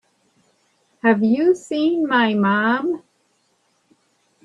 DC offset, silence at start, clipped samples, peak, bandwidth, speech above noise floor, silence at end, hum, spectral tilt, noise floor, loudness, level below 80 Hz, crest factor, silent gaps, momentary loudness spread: under 0.1%; 1.05 s; under 0.1%; -2 dBFS; 10 kHz; 47 dB; 1.45 s; none; -6 dB/octave; -65 dBFS; -19 LUFS; -70 dBFS; 20 dB; none; 5 LU